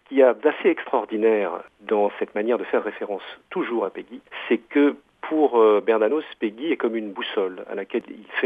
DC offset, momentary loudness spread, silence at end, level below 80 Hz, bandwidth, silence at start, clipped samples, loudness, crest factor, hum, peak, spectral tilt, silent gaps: under 0.1%; 14 LU; 0 s; -74 dBFS; 3.8 kHz; 0.1 s; under 0.1%; -23 LUFS; 18 dB; none; -4 dBFS; -7 dB/octave; none